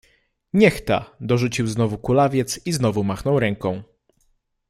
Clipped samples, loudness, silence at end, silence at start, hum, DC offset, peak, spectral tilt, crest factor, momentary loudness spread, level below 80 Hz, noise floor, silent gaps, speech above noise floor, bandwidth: under 0.1%; -21 LUFS; 0.85 s; 0.55 s; none; under 0.1%; -2 dBFS; -6 dB/octave; 20 dB; 7 LU; -48 dBFS; -66 dBFS; none; 46 dB; 15.5 kHz